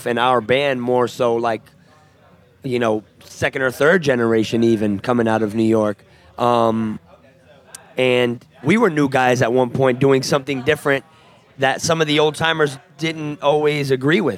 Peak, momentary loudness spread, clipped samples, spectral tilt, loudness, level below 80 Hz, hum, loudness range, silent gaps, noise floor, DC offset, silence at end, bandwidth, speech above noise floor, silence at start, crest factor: -2 dBFS; 8 LU; under 0.1%; -5.5 dB/octave; -18 LUFS; -60 dBFS; none; 3 LU; none; -51 dBFS; under 0.1%; 0 s; 16 kHz; 33 dB; 0 s; 16 dB